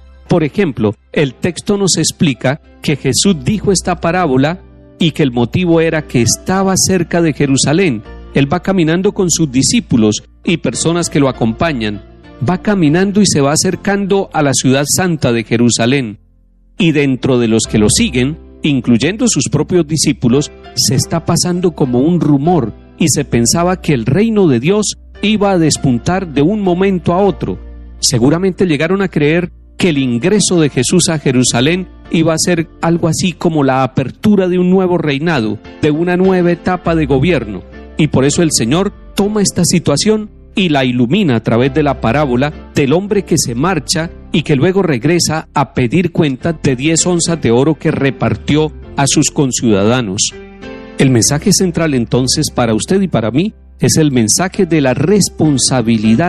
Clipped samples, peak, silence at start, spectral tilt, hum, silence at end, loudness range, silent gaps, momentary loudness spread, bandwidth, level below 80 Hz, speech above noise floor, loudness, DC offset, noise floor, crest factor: under 0.1%; 0 dBFS; 0.3 s; -4.5 dB/octave; none; 0 s; 1 LU; none; 5 LU; 13.5 kHz; -36 dBFS; 35 dB; -13 LUFS; under 0.1%; -47 dBFS; 12 dB